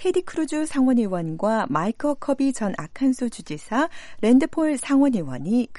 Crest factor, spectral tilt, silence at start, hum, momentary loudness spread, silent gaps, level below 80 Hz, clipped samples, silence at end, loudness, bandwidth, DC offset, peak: 14 dB; -6 dB/octave; 0 s; none; 9 LU; none; -52 dBFS; under 0.1%; 0 s; -23 LUFS; 11.5 kHz; under 0.1%; -8 dBFS